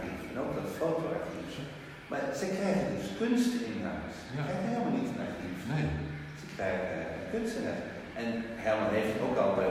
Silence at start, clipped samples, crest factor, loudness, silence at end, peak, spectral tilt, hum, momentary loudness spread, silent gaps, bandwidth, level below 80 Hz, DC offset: 0 s; under 0.1%; 18 dB; -34 LUFS; 0 s; -16 dBFS; -6 dB/octave; none; 11 LU; none; 15.5 kHz; -56 dBFS; under 0.1%